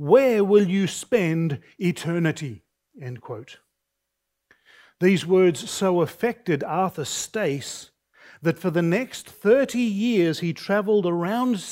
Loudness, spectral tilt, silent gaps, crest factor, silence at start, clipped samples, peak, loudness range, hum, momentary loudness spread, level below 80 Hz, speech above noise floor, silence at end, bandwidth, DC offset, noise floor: -23 LUFS; -5.5 dB/octave; none; 20 dB; 0 s; under 0.1%; -4 dBFS; 7 LU; none; 16 LU; -68 dBFS; 58 dB; 0 s; 16 kHz; under 0.1%; -80 dBFS